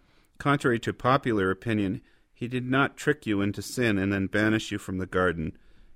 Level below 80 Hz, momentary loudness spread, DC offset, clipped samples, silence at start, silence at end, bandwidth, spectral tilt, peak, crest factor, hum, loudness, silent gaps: -54 dBFS; 8 LU; under 0.1%; under 0.1%; 0.4 s; 0.05 s; 16 kHz; -6 dB/octave; -10 dBFS; 18 dB; none; -27 LUFS; none